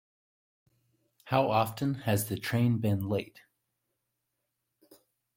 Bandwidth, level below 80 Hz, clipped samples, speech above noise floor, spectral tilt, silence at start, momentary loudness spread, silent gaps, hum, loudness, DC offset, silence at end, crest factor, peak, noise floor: 16.5 kHz; -66 dBFS; under 0.1%; 54 dB; -6 dB/octave; 1.25 s; 6 LU; none; none; -30 LUFS; under 0.1%; 2.1 s; 22 dB; -10 dBFS; -83 dBFS